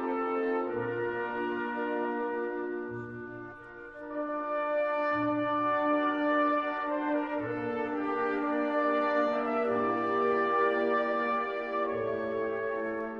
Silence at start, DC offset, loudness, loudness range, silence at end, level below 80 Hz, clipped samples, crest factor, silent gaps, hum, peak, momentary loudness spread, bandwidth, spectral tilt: 0 s; under 0.1%; -30 LUFS; 6 LU; 0 s; -66 dBFS; under 0.1%; 14 dB; none; none; -16 dBFS; 9 LU; 6.4 kHz; -7.5 dB/octave